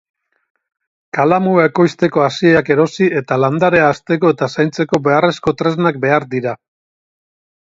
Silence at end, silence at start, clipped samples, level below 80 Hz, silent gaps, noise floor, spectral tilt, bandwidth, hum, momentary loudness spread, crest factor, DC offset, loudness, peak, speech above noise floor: 1.1 s; 1.15 s; under 0.1%; -54 dBFS; none; under -90 dBFS; -7 dB/octave; 7.8 kHz; none; 5 LU; 14 dB; under 0.1%; -14 LUFS; 0 dBFS; over 76 dB